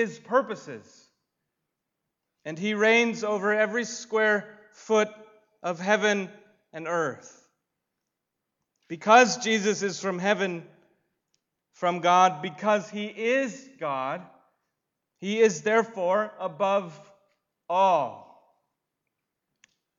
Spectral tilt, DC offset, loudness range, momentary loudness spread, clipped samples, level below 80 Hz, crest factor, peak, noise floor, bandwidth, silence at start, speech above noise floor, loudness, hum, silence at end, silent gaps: -4 dB/octave; under 0.1%; 4 LU; 17 LU; under 0.1%; -84 dBFS; 22 dB; -6 dBFS; -84 dBFS; 7.8 kHz; 0 s; 59 dB; -25 LUFS; none; 1.75 s; none